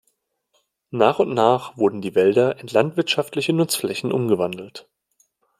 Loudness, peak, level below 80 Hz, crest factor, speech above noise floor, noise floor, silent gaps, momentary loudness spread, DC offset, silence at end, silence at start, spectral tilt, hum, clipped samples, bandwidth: -20 LUFS; -2 dBFS; -66 dBFS; 20 dB; 51 dB; -70 dBFS; none; 6 LU; under 0.1%; 0.8 s; 0.95 s; -5 dB/octave; none; under 0.1%; 15.5 kHz